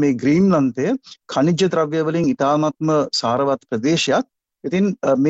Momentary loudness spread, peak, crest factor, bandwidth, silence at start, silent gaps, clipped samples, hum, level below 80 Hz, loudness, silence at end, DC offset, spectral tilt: 7 LU; -6 dBFS; 12 dB; 8.2 kHz; 0 s; none; under 0.1%; none; -58 dBFS; -19 LUFS; 0 s; under 0.1%; -6 dB/octave